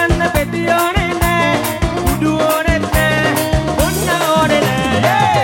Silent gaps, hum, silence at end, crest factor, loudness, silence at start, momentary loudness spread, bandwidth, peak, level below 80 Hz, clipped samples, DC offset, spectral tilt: none; none; 0 s; 14 dB; -14 LUFS; 0 s; 4 LU; 17 kHz; 0 dBFS; -26 dBFS; under 0.1%; under 0.1%; -5 dB/octave